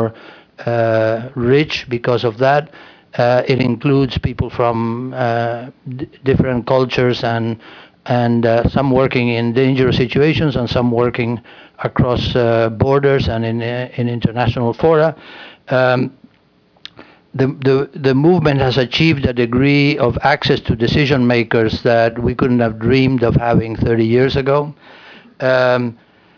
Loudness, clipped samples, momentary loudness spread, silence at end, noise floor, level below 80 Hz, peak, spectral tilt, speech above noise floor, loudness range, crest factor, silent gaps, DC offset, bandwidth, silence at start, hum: -15 LUFS; under 0.1%; 9 LU; 0.45 s; -54 dBFS; -38 dBFS; -2 dBFS; -8 dB/octave; 39 dB; 4 LU; 14 dB; none; under 0.1%; 5.4 kHz; 0 s; none